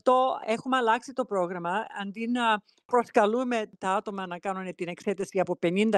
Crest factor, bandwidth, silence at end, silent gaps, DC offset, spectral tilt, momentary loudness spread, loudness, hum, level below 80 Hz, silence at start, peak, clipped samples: 20 dB; 12 kHz; 0 s; 2.85-2.89 s; under 0.1%; -5.5 dB/octave; 9 LU; -28 LUFS; none; -76 dBFS; 0.05 s; -8 dBFS; under 0.1%